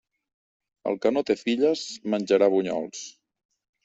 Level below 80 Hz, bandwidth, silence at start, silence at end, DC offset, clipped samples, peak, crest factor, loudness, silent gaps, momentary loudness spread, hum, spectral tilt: -70 dBFS; 8.2 kHz; 0.85 s; 0.75 s; under 0.1%; under 0.1%; -8 dBFS; 18 dB; -25 LUFS; none; 14 LU; none; -4.5 dB/octave